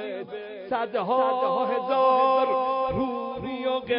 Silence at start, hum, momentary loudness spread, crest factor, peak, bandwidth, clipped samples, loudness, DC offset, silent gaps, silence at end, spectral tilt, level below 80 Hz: 0 s; none; 12 LU; 14 dB; -10 dBFS; 5.4 kHz; under 0.1%; -25 LUFS; under 0.1%; none; 0 s; -9.5 dB/octave; -54 dBFS